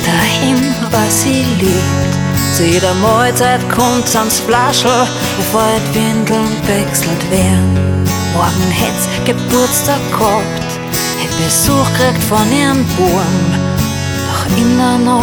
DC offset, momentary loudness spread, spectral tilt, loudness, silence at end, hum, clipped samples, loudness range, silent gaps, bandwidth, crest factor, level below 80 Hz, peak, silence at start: under 0.1%; 4 LU; -4.5 dB/octave; -12 LUFS; 0 s; none; under 0.1%; 2 LU; none; 19.5 kHz; 12 dB; -34 dBFS; 0 dBFS; 0 s